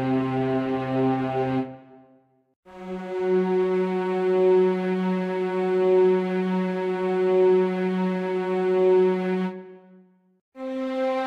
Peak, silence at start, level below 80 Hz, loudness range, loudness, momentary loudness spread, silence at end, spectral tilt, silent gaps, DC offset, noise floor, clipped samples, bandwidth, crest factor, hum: -10 dBFS; 0 s; -66 dBFS; 5 LU; -23 LUFS; 11 LU; 0 s; -8.5 dB/octave; 2.56-2.63 s, 10.41-10.52 s; under 0.1%; -60 dBFS; under 0.1%; 6 kHz; 12 dB; none